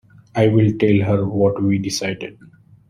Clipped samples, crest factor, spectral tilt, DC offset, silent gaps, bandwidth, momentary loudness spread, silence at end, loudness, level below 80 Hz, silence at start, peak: under 0.1%; 16 dB; -6.5 dB/octave; under 0.1%; none; 14 kHz; 12 LU; 0.55 s; -18 LUFS; -50 dBFS; 0.35 s; -4 dBFS